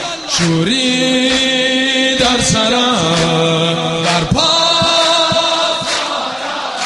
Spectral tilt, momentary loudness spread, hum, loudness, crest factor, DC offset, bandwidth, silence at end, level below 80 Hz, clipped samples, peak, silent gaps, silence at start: -3 dB/octave; 6 LU; none; -12 LUFS; 14 dB; under 0.1%; 11.5 kHz; 0 s; -40 dBFS; under 0.1%; 0 dBFS; none; 0 s